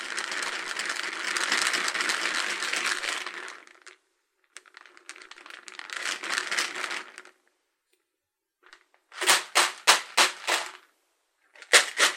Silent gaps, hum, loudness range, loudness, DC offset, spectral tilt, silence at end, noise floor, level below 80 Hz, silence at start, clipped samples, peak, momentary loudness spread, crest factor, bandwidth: none; none; 9 LU; -25 LUFS; under 0.1%; 2 dB/octave; 0 s; -84 dBFS; -86 dBFS; 0 s; under 0.1%; -2 dBFS; 23 LU; 28 dB; 16.5 kHz